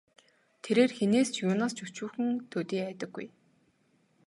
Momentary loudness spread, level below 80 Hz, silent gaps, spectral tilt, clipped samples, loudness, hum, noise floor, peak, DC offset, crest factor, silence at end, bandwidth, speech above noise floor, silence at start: 15 LU; -80 dBFS; none; -5 dB/octave; under 0.1%; -30 LUFS; none; -70 dBFS; -12 dBFS; under 0.1%; 20 dB; 1 s; 11.5 kHz; 40 dB; 0.65 s